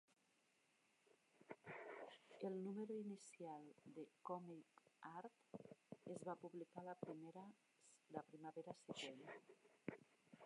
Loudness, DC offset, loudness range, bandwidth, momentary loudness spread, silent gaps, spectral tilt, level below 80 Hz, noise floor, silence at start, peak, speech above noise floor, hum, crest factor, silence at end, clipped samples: -56 LUFS; under 0.1%; 3 LU; 11 kHz; 12 LU; none; -5.5 dB/octave; under -90 dBFS; -83 dBFS; 0.1 s; -32 dBFS; 28 dB; none; 24 dB; 0 s; under 0.1%